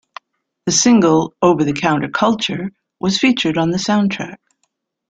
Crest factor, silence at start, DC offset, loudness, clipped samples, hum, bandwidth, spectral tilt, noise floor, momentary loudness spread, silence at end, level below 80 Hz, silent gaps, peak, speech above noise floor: 16 dB; 0.65 s; under 0.1%; -16 LUFS; under 0.1%; none; 9.4 kHz; -4 dB/octave; -69 dBFS; 14 LU; 0.75 s; -54 dBFS; none; 0 dBFS; 54 dB